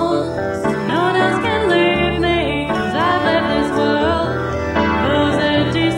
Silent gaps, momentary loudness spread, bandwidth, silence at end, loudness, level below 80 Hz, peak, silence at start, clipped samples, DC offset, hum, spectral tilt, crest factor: none; 5 LU; 12 kHz; 0 s; -17 LUFS; -34 dBFS; -4 dBFS; 0 s; under 0.1%; under 0.1%; none; -6 dB/octave; 14 dB